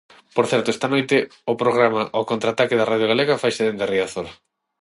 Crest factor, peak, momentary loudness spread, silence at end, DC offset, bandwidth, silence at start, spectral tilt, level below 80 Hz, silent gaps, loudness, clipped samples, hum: 18 dB; -2 dBFS; 7 LU; 0.5 s; under 0.1%; 11.5 kHz; 0.35 s; -5 dB/octave; -62 dBFS; none; -20 LUFS; under 0.1%; none